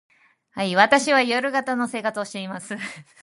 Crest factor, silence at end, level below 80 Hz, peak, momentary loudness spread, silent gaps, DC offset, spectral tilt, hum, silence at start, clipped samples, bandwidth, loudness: 22 dB; 0.2 s; -72 dBFS; -2 dBFS; 15 LU; none; under 0.1%; -3.5 dB/octave; none; 0.55 s; under 0.1%; 11.5 kHz; -22 LUFS